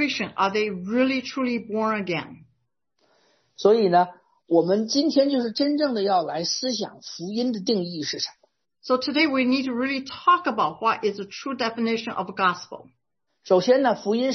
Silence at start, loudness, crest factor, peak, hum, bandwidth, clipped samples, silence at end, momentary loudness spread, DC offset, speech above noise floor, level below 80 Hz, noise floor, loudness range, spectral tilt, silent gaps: 0 s; -23 LUFS; 18 dB; -6 dBFS; none; 6.4 kHz; under 0.1%; 0 s; 10 LU; under 0.1%; 51 dB; -70 dBFS; -74 dBFS; 4 LU; -4.5 dB/octave; none